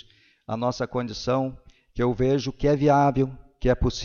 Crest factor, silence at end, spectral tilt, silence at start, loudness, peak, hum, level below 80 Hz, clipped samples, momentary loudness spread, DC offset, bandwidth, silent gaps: 16 dB; 0 s; -7 dB/octave; 0.5 s; -24 LUFS; -8 dBFS; none; -38 dBFS; under 0.1%; 10 LU; under 0.1%; 7.2 kHz; none